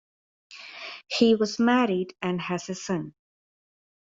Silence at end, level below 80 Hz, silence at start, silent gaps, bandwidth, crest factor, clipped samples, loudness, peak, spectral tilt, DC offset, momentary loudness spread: 1.05 s; -70 dBFS; 0.5 s; none; 7.8 kHz; 20 dB; under 0.1%; -25 LUFS; -8 dBFS; -5 dB/octave; under 0.1%; 18 LU